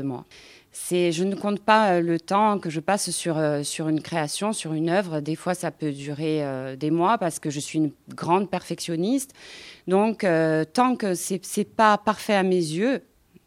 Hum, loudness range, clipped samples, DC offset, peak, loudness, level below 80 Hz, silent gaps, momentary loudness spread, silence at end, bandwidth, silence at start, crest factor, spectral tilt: none; 4 LU; under 0.1%; under 0.1%; -4 dBFS; -24 LUFS; -68 dBFS; none; 9 LU; 0.45 s; 16.5 kHz; 0 s; 20 dB; -5 dB/octave